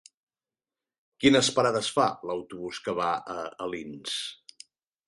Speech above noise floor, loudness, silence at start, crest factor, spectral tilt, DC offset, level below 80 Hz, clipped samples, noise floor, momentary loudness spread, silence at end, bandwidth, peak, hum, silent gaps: over 63 dB; -27 LUFS; 1.2 s; 22 dB; -3.5 dB/octave; under 0.1%; -64 dBFS; under 0.1%; under -90 dBFS; 15 LU; 0.75 s; 11.5 kHz; -8 dBFS; none; none